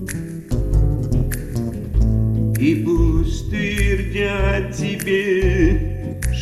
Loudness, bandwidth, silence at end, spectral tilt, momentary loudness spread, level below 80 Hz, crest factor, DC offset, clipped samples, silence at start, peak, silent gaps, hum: -20 LUFS; 13.5 kHz; 0 s; -6.5 dB/octave; 8 LU; -22 dBFS; 16 dB; under 0.1%; under 0.1%; 0 s; -2 dBFS; none; none